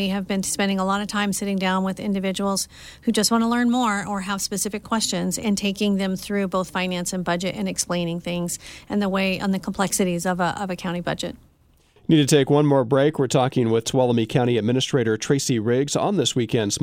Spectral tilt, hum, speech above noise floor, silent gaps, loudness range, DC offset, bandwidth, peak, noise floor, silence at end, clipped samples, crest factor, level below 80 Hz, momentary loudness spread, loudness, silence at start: -4.5 dB/octave; none; 36 dB; none; 5 LU; under 0.1%; 16.5 kHz; -6 dBFS; -58 dBFS; 0 s; under 0.1%; 16 dB; -52 dBFS; 7 LU; -22 LUFS; 0 s